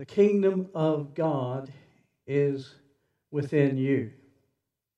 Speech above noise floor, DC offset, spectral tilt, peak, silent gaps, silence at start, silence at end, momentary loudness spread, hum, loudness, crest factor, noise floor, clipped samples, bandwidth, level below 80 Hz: 55 dB; under 0.1%; -9 dB/octave; -10 dBFS; none; 0 s; 0.9 s; 14 LU; none; -27 LUFS; 18 dB; -81 dBFS; under 0.1%; 8 kHz; -78 dBFS